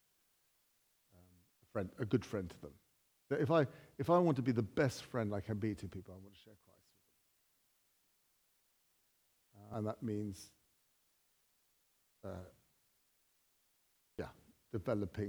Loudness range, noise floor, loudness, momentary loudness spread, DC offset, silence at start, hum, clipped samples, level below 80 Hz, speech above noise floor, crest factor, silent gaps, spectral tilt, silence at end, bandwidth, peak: 21 LU; -77 dBFS; -38 LUFS; 20 LU; under 0.1%; 1.75 s; none; under 0.1%; -72 dBFS; 39 dB; 22 dB; none; -7.5 dB/octave; 0 s; over 20 kHz; -18 dBFS